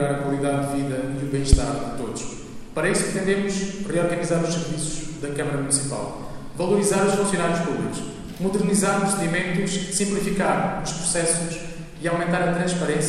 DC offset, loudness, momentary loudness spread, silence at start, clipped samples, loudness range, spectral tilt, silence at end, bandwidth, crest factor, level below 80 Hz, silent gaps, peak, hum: under 0.1%; -23 LUFS; 10 LU; 0 s; under 0.1%; 2 LU; -4.5 dB/octave; 0 s; 14 kHz; 22 dB; -34 dBFS; none; 0 dBFS; none